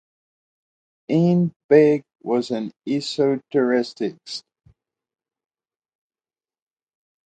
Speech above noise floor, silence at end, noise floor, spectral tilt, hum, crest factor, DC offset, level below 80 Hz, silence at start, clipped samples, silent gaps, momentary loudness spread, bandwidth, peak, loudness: over 70 dB; 2.9 s; under -90 dBFS; -7 dB/octave; none; 22 dB; under 0.1%; -70 dBFS; 1.1 s; under 0.1%; 1.56-1.69 s; 13 LU; 9.2 kHz; -2 dBFS; -21 LUFS